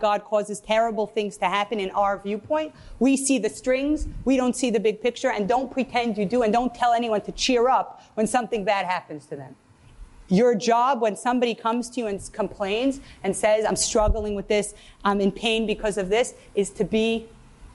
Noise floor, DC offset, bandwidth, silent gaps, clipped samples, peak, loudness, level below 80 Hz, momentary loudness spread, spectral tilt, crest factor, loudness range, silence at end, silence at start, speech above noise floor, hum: -47 dBFS; under 0.1%; 11.5 kHz; none; under 0.1%; -8 dBFS; -24 LUFS; -42 dBFS; 8 LU; -4 dB/octave; 14 dB; 2 LU; 0.05 s; 0 s; 23 dB; none